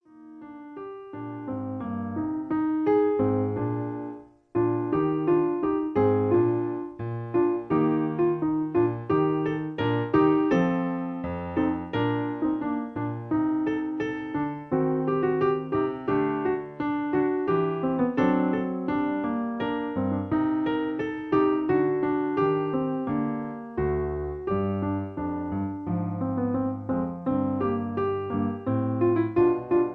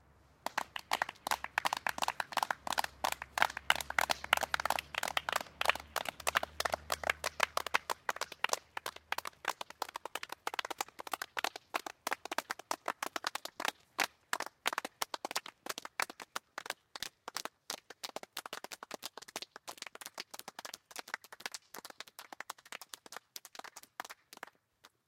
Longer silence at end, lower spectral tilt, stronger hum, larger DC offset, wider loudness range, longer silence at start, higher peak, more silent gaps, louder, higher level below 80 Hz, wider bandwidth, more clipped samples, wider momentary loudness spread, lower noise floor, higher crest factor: second, 0 s vs 0.2 s; first, -9.5 dB/octave vs -0.5 dB/octave; neither; neither; second, 4 LU vs 12 LU; second, 0.15 s vs 0.45 s; about the same, -10 dBFS vs -10 dBFS; neither; first, -26 LUFS vs -38 LUFS; first, -52 dBFS vs -68 dBFS; second, 6.2 kHz vs 17 kHz; neither; second, 9 LU vs 14 LU; second, -46 dBFS vs -67 dBFS; second, 16 dB vs 30 dB